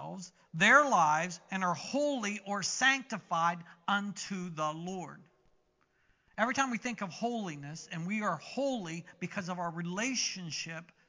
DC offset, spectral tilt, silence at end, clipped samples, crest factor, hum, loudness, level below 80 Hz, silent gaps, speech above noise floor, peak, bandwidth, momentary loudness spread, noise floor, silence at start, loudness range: under 0.1%; -3.5 dB/octave; 0.25 s; under 0.1%; 22 dB; none; -32 LUFS; -80 dBFS; none; 40 dB; -10 dBFS; 7.8 kHz; 14 LU; -73 dBFS; 0 s; 8 LU